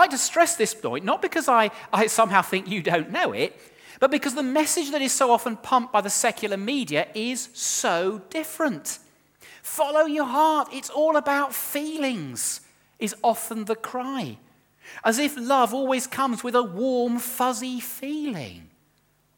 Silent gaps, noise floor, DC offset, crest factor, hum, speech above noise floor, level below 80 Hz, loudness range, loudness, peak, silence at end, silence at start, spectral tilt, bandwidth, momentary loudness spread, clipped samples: none; -65 dBFS; under 0.1%; 22 dB; none; 41 dB; -72 dBFS; 4 LU; -24 LUFS; -2 dBFS; 0.75 s; 0 s; -3 dB/octave; 19 kHz; 11 LU; under 0.1%